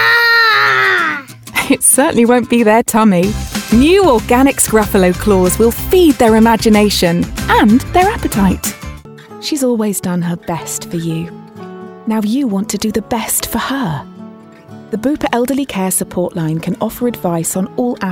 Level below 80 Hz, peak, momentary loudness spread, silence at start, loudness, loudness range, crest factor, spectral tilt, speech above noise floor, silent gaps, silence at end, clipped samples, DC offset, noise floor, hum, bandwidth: -32 dBFS; 0 dBFS; 12 LU; 0 s; -12 LUFS; 8 LU; 12 dB; -4 dB/octave; 23 dB; none; 0 s; under 0.1%; under 0.1%; -35 dBFS; none; 19.5 kHz